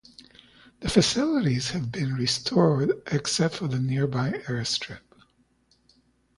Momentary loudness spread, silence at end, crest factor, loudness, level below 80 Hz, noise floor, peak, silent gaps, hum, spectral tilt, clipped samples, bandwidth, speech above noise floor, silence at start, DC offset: 8 LU; 1.4 s; 20 dB; -25 LUFS; -52 dBFS; -65 dBFS; -6 dBFS; none; none; -5 dB/octave; under 0.1%; 11.5 kHz; 40 dB; 0.8 s; under 0.1%